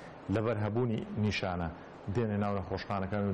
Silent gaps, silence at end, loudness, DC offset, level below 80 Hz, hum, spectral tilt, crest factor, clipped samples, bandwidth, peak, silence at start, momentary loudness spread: none; 0 s; -34 LUFS; under 0.1%; -56 dBFS; none; -7.5 dB/octave; 10 dB; under 0.1%; 8.4 kHz; -22 dBFS; 0 s; 5 LU